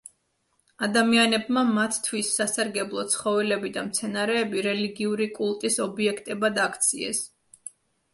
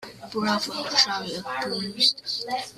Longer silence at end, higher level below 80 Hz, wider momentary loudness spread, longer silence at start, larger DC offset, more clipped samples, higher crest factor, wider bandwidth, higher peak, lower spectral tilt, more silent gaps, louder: first, 0.45 s vs 0.05 s; about the same, -70 dBFS vs -66 dBFS; about the same, 8 LU vs 9 LU; first, 0.8 s vs 0 s; neither; neither; about the same, 20 dB vs 22 dB; second, 12 kHz vs 15.5 kHz; about the same, -6 dBFS vs -6 dBFS; about the same, -2.5 dB/octave vs -2 dB/octave; neither; about the same, -25 LUFS vs -24 LUFS